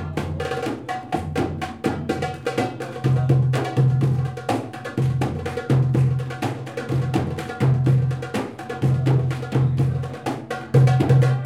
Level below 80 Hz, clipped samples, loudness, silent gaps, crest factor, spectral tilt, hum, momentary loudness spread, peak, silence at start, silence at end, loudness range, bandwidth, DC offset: -50 dBFS; under 0.1%; -22 LUFS; none; 16 dB; -7.5 dB/octave; none; 10 LU; -6 dBFS; 0 s; 0 s; 2 LU; 11 kHz; under 0.1%